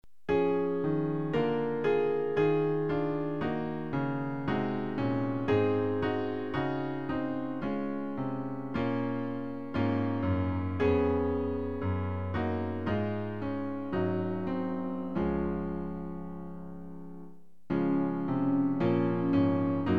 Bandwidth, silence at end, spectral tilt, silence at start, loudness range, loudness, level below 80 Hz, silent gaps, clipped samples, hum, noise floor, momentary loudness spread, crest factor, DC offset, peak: 6 kHz; 0 s; -9.5 dB/octave; 0.3 s; 4 LU; -31 LUFS; -54 dBFS; none; under 0.1%; none; -53 dBFS; 8 LU; 16 dB; 0.5%; -16 dBFS